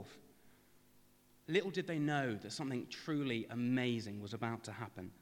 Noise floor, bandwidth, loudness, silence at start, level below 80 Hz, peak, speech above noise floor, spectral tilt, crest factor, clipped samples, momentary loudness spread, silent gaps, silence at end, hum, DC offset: -67 dBFS; 17 kHz; -39 LUFS; 0 s; -80 dBFS; -22 dBFS; 28 dB; -6 dB/octave; 18 dB; under 0.1%; 11 LU; none; 0.1 s; 50 Hz at -65 dBFS; under 0.1%